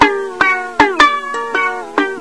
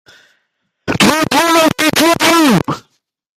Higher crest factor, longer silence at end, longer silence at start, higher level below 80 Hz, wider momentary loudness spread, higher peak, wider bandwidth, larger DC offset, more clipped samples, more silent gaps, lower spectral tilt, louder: about the same, 14 dB vs 14 dB; second, 0 s vs 0.6 s; second, 0 s vs 0.85 s; first, -44 dBFS vs -50 dBFS; second, 8 LU vs 13 LU; about the same, 0 dBFS vs 0 dBFS; second, 11 kHz vs 16 kHz; first, 0.5% vs under 0.1%; first, 0.2% vs under 0.1%; neither; about the same, -3 dB/octave vs -3.5 dB/octave; second, -14 LUFS vs -11 LUFS